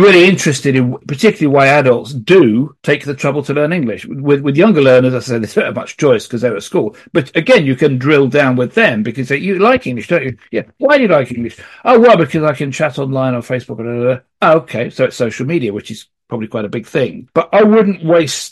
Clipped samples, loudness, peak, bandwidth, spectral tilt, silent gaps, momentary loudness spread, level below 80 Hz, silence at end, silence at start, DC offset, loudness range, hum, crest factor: under 0.1%; -13 LUFS; 0 dBFS; 12.5 kHz; -6 dB/octave; none; 12 LU; -54 dBFS; 0.05 s; 0 s; under 0.1%; 4 LU; none; 12 dB